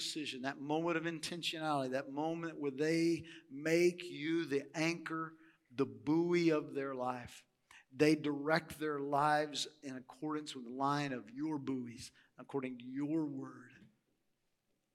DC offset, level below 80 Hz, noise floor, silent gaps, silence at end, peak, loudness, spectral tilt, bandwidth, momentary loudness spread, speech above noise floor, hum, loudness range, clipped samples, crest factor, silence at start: under 0.1%; -80 dBFS; -82 dBFS; none; 1.1 s; -16 dBFS; -37 LUFS; -5 dB/octave; 15 kHz; 14 LU; 45 dB; none; 6 LU; under 0.1%; 22 dB; 0 s